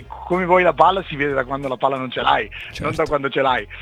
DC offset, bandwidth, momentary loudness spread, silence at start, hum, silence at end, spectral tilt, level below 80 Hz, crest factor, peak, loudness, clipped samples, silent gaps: under 0.1%; 12.5 kHz; 9 LU; 0 s; none; 0 s; -6 dB/octave; -42 dBFS; 20 dB; 0 dBFS; -19 LUFS; under 0.1%; none